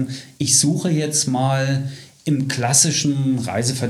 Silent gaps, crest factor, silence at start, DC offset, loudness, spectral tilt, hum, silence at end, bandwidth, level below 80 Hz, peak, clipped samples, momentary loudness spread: none; 20 dB; 0 s; under 0.1%; -18 LUFS; -3.5 dB/octave; none; 0 s; 14.5 kHz; -60 dBFS; 0 dBFS; under 0.1%; 10 LU